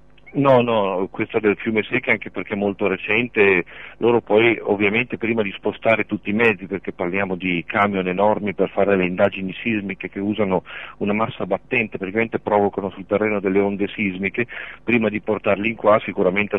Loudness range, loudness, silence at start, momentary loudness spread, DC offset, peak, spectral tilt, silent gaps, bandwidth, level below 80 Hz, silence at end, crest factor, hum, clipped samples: 3 LU; -20 LUFS; 0.25 s; 8 LU; 0.4%; -2 dBFS; -8.5 dB/octave; none; 5.6 kHz; -56 dBFS; 0 s; 18 dB; none; under 0.1%